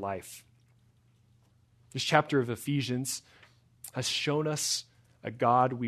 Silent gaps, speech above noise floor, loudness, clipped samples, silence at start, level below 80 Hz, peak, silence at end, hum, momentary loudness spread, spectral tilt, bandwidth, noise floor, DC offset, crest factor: none; 35 dB; -30 LUFS; under 0.1%; 0 s; -72 dBFS; -6 dBFS; 0 s; none; 17 LU; -4 dB/octave; 13.5 kHz; -65 dBFS; under 0.1%; 26 dB